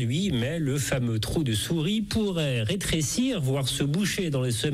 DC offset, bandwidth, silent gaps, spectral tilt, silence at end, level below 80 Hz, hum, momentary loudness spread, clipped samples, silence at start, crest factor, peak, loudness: under 0.1%; 16 kHz; none; -5 dB/octave; 0 s; -46 dBFS; none; 1 LU; under 0.1%; 0 s; 12 dB; -14 dBFS; -26 LUFS